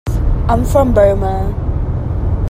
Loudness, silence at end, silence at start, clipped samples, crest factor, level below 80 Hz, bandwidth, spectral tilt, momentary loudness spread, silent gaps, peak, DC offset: -15 LUFS; 0.05 s; 0.05 s; under 0.1%; 14 dB; -18 dBFS; 15.5 kHz; -8.5 dB/octave; 8 LU; none; 0 dBFS; under 0.1%